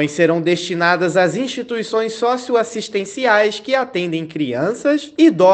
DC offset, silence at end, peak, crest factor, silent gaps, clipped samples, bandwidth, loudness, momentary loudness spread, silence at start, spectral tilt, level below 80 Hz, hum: under 0.1%; 0 s; 0 dBFS; 16 dB; none; under 0.1%; 9 kHz; -17 LUFS; 8 LU; 0 s; -5 dB/octave; -64 dBFS; none